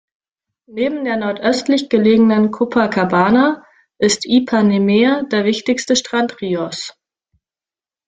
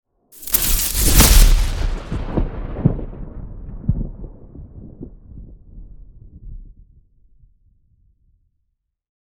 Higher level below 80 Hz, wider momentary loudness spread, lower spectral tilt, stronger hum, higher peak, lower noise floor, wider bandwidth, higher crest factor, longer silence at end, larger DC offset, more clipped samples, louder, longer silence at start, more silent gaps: second, -56 dBFS vs -22 dBFS; second, 9 LU vs 28 LU; about the same, -4.5 dB/octave vs -3.5 dB/octave; neither; about the same, -2 dBFS vs 0 dBFS; first, under -90 dBFS vs -71 dBFS; second, 9.4 kHz vs over 20 kHz; second, 14 dB vs 20 dB; second, 1.15 s vs 2.55 s; neither; neither; first, -15 LUFS vs -18 LUFS; first, 0.7 s vs 0.4 s; neither